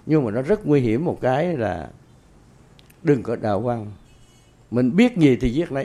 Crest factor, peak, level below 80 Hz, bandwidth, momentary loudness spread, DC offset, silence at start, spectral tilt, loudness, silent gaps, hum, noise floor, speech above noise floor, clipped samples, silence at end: 18 dB; -4 dBFS; -44 dBFS; 11 kHz; 10 LU; under 0.1%; 0.05 s; -8 dB/octave; -21 LUFS; none; none; -51 dBFS; 32 dB; under 0.1%; 0 s